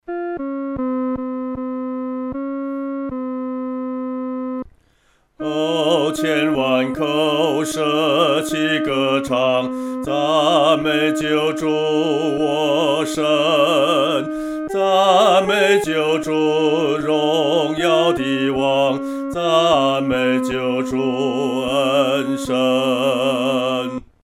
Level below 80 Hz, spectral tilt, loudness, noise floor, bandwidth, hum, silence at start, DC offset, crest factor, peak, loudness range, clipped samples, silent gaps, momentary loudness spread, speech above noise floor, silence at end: -52 dBFS; -4.5 dB/octave; -18 LUFS; -59 dBFS; 15.5 kHz; none; 0.1 s; under 0.1%; 16 dB; -2 dBFS; 9 LU; under 0.1%; none; 10 LU; 42 dB; 0.25 s